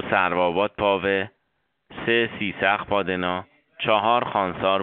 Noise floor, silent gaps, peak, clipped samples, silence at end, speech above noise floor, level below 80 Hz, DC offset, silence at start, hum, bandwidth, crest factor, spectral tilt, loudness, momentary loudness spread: -74 dBFS; none; -4 dBFS; under 0.1%; 0 s; 52 dB; -56 dBFS; under 0.1%; 0 s; none; 4.5 kHz; 20 dB; -2.5 dB/octave; -23 LUFS; 8 LU